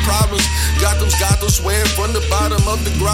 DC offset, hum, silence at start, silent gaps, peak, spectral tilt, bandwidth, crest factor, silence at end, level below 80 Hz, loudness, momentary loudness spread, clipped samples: under 0.1%; none; 0 s; none; 0 dBFS; -3.5 dB/octave; 17 kHz; 16 dB; 0 s; -18 dBFS; -16 LUFS; 3 LU; under 0.1%